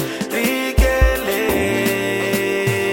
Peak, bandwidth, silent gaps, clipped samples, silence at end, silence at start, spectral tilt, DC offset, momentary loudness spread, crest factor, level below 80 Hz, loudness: -2 dBFS; 17 kHz; none; under 0.1%; 0 s; 0 s; -4.5 dB/octave; under 0.1%; 3 LU; 16 dB; -24 dBFS; -18 LUFS